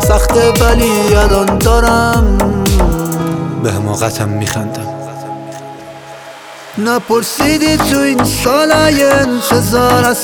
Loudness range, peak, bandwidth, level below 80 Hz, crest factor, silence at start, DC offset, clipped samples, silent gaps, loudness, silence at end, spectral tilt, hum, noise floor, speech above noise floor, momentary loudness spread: 8 LU; 0 dBFS; 20 kHz; -20 dBFS; 12 dB; 0 s; under 0.1%; under 0.1%; none; -11 LUFS; 0 s; -5 dB/octave; none; -31 dBFS; 20 dB; 17 LU